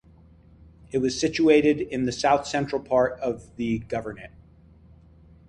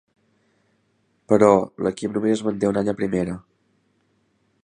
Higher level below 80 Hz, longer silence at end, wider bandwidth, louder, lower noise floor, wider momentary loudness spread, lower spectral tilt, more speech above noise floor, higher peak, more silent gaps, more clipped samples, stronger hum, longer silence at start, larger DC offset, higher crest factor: about the same, -52 dBFS vs -56 dBFS; about the same, 1.2 s vs 1.25 s; about the same, 10.5 kHz vs 10.5 kHz; second, -24 LUFS vs -21 LUFS; second, -53 dBFS vs -67 dBFS; about the same, 12 LU vs 10 LU; second, -5 dB/octave vs -7 dB/octave; second, 29 dB vs 47 dB; second, -6 dBFS vs -2 dBFS; neither; neither; neither; second, 0.95 s vs 1.3 s; neither; about the same, 20 dB vs 22 dB